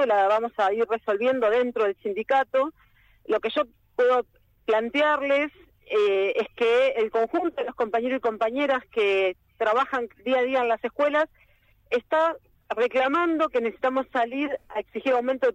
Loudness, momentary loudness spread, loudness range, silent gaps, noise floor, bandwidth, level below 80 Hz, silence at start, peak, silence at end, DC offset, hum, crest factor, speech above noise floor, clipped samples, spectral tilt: -25 LUFS; 7 LU; 2 LU; none; -60 dBFS; 8.8 kHz; -64 dBFS; 0 s; -12 dBFS; 0 s; under 0.1%; none; 14 dB; 36 dB; under 0.1%; -4.5 dB/octave